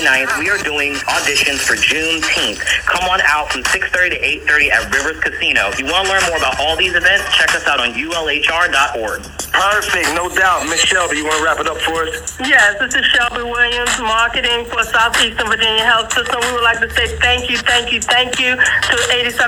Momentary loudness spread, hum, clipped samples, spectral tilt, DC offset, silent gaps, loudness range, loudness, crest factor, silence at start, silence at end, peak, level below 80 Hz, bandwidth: 5 LU; none; under 0.1%; -1 dB/octave; under 0.1%; none; 1 LU; -13 LUFS; 14 dB; 0 s; 0 s; 0 dBFS; -36 dBFS; over 20 kHz